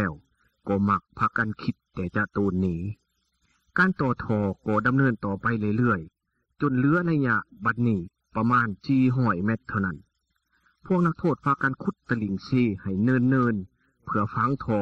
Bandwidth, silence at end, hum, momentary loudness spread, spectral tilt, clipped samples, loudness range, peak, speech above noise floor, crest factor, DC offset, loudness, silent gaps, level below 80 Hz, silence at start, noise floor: 6.6 kHz; 0 s; none; 9 LU; -9.5 dB/octave; under 0.1%; 3 LU; -10 dBFS; 49 dB; 16 dB; under 0.1%; -25 LUFS; none; -56 dBFS; 0 s; -74 dBFS